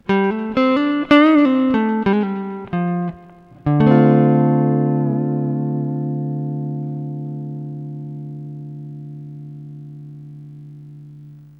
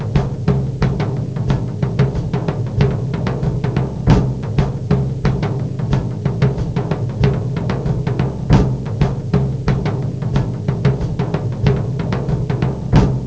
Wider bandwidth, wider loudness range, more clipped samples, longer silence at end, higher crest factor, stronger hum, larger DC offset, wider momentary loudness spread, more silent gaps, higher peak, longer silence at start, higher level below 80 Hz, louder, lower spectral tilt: second, 5.8 kHz vs 8 kHz; first, 17 LU vs 1 LU; neither; first, 0.15 s vs 0 s; about the same, 18 dB vs 16 dB; first, 50 Hz at -50 dBFS vs none; second, under 0.1% vs 0.8%; first, 24 LU vs 5 LU; neither; about the same, -2 dBFS vs 0 dBFS; about the same, 0.1 s vs 0 s; second, -52 dBFS vs -28 dBFS; about the same, -18 LUFS vs -18 LUFS; about the same, -9.5 dB/octave vs -8.5 dB/octave